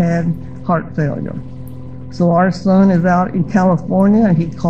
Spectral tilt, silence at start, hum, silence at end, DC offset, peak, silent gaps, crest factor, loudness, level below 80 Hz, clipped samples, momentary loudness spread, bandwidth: -9 dB/octave; 0 s; none; 0 s; 2%; -2 dBFS; none; 12 dB; -14 LUFS; -40 dBFS; under 0.1%; 19 LU; 7.8 kHz